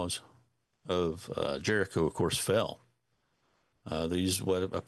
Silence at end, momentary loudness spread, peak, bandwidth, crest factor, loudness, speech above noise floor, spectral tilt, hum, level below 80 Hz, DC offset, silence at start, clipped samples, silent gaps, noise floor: 0.05 s; 10 LU; -16 dBFS; 12.5 kHz; 18 dB; -32 LUFS; 46 dB; -4.5 dB/octave; none; -62 dBFS; under 0.1%; 0 s; under 0.1%; none; -77 dBFS